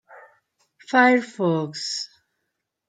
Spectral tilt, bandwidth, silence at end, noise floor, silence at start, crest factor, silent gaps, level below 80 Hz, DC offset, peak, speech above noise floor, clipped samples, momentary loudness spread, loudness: -4.5 dB/octave; 9.4 kHz; 0.8 s; -79 dBFS; 0.1 s; 20 dB; none; -80 dBFS; under 0.1%; -4 dBFS; 58 dB; under 0.1%; 13 LU; -21 LUFS